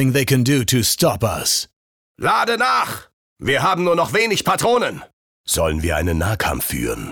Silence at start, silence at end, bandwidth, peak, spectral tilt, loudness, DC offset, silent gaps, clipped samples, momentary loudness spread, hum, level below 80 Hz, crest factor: 0 s; 0 s; 19.5 kHz; -4 dBFS; -4 dB/octave; -18 LUFS; under 0.1%; 1.73-2.15 s, 3.13-3.36 s, 5.13-5.44 s; under 0.1%; 8 LU; none; -36 dBFS; 14 dB